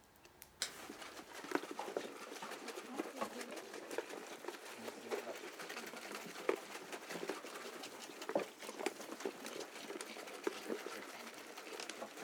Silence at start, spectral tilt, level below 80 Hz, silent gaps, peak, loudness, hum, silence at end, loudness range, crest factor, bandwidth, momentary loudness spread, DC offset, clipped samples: 0 s; -2 dB/octave; -86 dBFS; none; -18 dBFS; -46 LUFS; none; 0 s; 2 LU; 28 dB; over 20 kHz; 7 LU; under 0.1%; under 0.1%